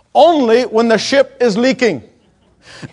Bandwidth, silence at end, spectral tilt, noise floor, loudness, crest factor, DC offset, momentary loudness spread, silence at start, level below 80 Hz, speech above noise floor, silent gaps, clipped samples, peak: 11 kHz; 0.05 s; -4.5 dB/octave; -52 dBFS; -12 LUFS; 14 dB; under 0.1%; 6 LU; 0.15 s; -58 dBFS; 40 dB; none; under 0.1%; 0 dBFS